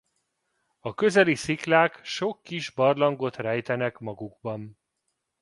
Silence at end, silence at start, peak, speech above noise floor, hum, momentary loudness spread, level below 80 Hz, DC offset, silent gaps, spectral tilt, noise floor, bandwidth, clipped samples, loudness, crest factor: 0.7 s; 0.85 s; -4 dBFS; 54 dB; none; 16 LU; -66 dBFS; under 0.1%; none; -5 dB/octave; -79 dBFS; 11.5 kHz; under 0.1%; -25 LUFS; 22 dB